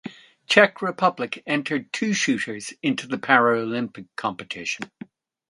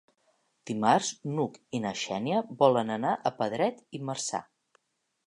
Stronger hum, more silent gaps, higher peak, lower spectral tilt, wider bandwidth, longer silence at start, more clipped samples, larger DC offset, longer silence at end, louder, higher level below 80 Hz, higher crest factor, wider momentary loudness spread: neither; neither; first, 0 dBFS vs -8 dBFS; about the same, -4 dB/octave vs -4.5 dB/octave; about the same, 11.5 kHz vs 11 kHz; second, 0.05 s vs 0.65 s; neither; neither; second, 0.65 s vs 0.85 s; first, -23 LUFS vs -29 LUFS; first, -70 dBFS vs -76 dBFS; about the same, 24 dB vs 22 dB; about the same, 13 LU vs 12 LU